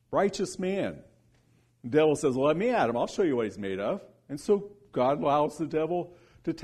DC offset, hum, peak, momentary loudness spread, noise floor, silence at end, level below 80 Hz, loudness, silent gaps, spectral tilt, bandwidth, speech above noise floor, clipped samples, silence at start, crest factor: under 0.1%; none; -12 dBFS; 12 LU; -65 dBFS; 0 s; -62 dBFS; -28 LUFS; none; -6 dB/octave; 12.5 kHz; 38 dB; under 0.1%; 0.1 s; 16 dB